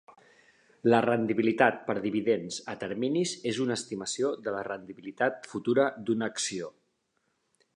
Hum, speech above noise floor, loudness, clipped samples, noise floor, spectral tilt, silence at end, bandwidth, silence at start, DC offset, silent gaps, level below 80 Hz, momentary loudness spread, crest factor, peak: none; 48 dB; -29 LUFS; under 0.1%; -76 dBFS; -4.5 dB/octave; 1.05 s; 11 kHz; 0.1 s; under 0.1%; none; -74 dBFS; 11 LU; 24 dB; -6 dBFS